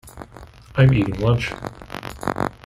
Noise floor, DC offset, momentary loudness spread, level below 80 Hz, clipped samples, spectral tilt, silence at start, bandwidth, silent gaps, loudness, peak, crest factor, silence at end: -43 dBFS; under 0.1%; 23 LU; -40 dBFS; under 0.1%; -7.5 dB/octave; 0.05 s; 12.5 kHz; none; -20 LUFS; -2 dBFS; 20 dB; 0.15 s